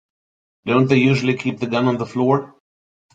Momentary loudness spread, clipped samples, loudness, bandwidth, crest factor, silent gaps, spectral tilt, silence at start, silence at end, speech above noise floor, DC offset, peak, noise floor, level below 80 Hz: 7 LU; under 0.1%; -18 LUFS; 7.8 kHz; 18 dB; none; -7 dB/octave; 0.65 s; 0.65 s; over 72 dB; under 0.1%; -2 dBFS; under -90 dBFS; -58 dBFS